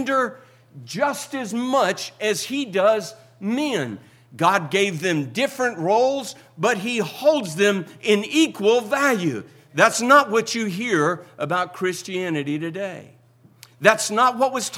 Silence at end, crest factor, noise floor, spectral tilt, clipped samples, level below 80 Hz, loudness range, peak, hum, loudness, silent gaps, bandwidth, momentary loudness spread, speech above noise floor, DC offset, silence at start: 0 s; 22 dB; -50 dBFS; -4 dB/octave; under 0.1%; -74 dBFS; 5 LU; 0 dBFS; none; -21 LUFS; none; 17 kHz; 11 LU; 29 dB; under 0.1%; 0 s